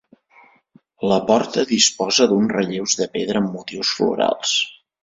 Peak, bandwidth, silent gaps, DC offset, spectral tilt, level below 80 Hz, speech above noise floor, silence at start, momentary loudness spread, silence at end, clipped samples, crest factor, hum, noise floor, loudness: 0 dBFS; 7.8 kHz; none; under 0.1%; -3 dB/octave; -60 dBFS; 36 dB; 1 s; 7 LU; 0.3 s; under 0.1%; 20 dB; none; -55 dBFS; -19 LUFS